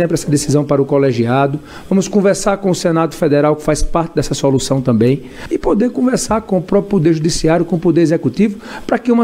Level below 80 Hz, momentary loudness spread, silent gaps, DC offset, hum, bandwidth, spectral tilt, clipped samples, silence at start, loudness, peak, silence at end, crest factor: -32 dBFS; 5 LU; none; under 0.1%; none; 16 kHz; -6 dB/octave; under 0.1%; 0 s; -14 LUFS; 0 dBFS; 0 s; 14 dB